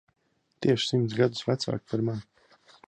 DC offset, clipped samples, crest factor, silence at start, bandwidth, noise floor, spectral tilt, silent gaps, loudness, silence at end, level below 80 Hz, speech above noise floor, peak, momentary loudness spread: under 0.1%; under 0.1%; 20 dB; 0.6 s; 9.6 kHz; -59 dBFS; -6 dB/octave; none; -28 LUFS; 0.65 s; -64 dBFS; 32 dB; -10 dBFS; 6 LU